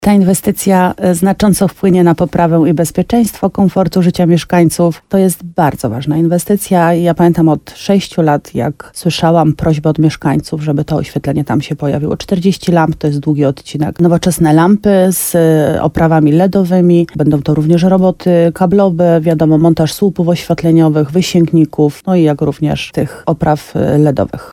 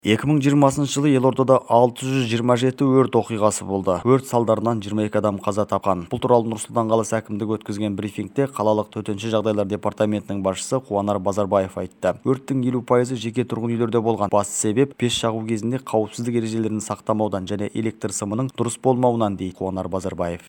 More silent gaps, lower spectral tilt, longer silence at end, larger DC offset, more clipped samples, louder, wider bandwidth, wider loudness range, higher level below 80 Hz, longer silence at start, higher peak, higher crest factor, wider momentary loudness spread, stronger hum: neither; about the same, -6.5 dB/octave vs -6 dB/octave; about the same, 0 s vs 0.1 s; neither; neither; first, -11 LUFS vs -21 LUFS; about the same, 17 kHz vs 18.5 kHz; about the same, 3 LU vs 5 LU; first, -38 dBFS vs -60 dBFS; about the same, 0 s vs 0.05 s; about the same, 0 dBFS vs -2 dBFS; second, 10 dB vs 20 dB; about the same, 6 LU vs 8 LU; neither